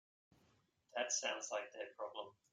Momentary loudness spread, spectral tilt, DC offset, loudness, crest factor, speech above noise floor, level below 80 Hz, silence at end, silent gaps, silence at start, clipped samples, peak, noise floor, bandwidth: 11 LU; 0.5 dB/octave; under 0.1%; -43 LUFS; 20 dB; 32 dB; under -90 dBFS; 0.2 s; none; 0.95 s; under 0.1%; -26 dBFS; -77 dBFS; 11 kHz